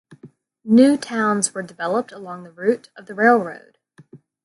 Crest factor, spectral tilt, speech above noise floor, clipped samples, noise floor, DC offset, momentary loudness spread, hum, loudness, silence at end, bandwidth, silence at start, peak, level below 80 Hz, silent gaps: 20 dB; -4.5 dB/octave; 29 dB; under 0.1%; -48 dBFS; under 0.1%; 21 LU; none; -19 LUFS; 0.3 s; 11.5 kHz; 0.25 s; -2 dBFS; -70 dBFS; none